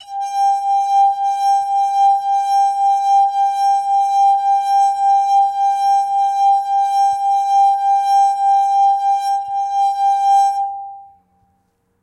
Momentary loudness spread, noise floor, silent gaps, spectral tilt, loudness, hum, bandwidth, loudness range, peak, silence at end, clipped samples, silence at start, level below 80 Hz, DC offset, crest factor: 4 LU; -64 dBFS; none; 1.5 dB/octave; -15 LUFS; none; 12 kHz; 1 LU; -6 dBFS; 1 s; under 0.1%; 0 s; -72 dBFS; under 0.1%; 8 dB